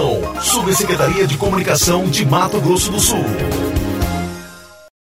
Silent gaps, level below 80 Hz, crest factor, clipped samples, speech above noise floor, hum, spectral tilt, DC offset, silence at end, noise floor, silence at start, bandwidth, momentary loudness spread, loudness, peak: none; -30 dBFS; 16 dB; under 0.1%; 23 dB; none; -4 dB/octave; under 0.1%; 0.35 s; -38 dBFS; 0 s; 16.5 kHz; 7 LU; -15 LUFS; 0 dBFS